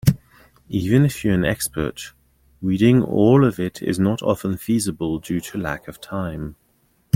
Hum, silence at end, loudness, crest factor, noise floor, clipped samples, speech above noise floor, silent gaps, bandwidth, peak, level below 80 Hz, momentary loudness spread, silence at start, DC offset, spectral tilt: none; 0.6 s; -20 LUFS; 18 dB; -62 dBFS; under 0.1%; 43 dB; none; 16.5 kHz; -2 dBFS; -44 dBFS; 15 LU; 0.05 s; under 0.1%; -6.5 dB/octave